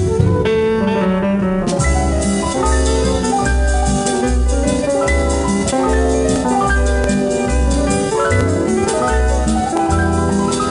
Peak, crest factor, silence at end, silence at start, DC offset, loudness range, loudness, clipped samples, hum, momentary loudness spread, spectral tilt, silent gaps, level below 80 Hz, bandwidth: 0 dBFS; 14 dB; 0 s; 0 s; under 0.1%; 0 LU; -16 LUFS; under 0.1%; none; 1 LU; -5.5 dB/octave; none; -20 dBFS; 11 kHz